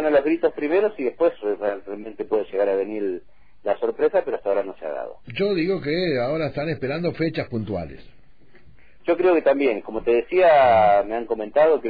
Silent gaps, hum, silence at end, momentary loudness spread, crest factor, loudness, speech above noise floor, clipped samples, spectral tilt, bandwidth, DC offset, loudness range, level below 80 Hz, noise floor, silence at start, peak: none; none; 0 s; 14 LU; 14 dB; -22 LUFS; 33 dB; under 0.1%; -9.5 dB/octave; 5 kHz; 0.6%; 6 LU; -52 dBFS; -54 dBFS; 0 s; -8 dBFS